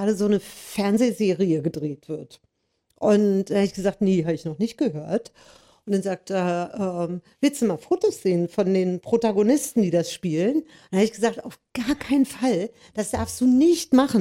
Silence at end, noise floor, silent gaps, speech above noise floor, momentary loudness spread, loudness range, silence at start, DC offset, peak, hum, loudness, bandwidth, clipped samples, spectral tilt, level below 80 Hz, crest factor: 0 s; -72 dBFS; none; 49 dB; 10 LU; 3 LU; 0 s; under 0.1%; -2 dBFS; none; -23 LUFS; 16 kHz; under 0.1%; -6 dB/octave; -56 dBFS; 20 dB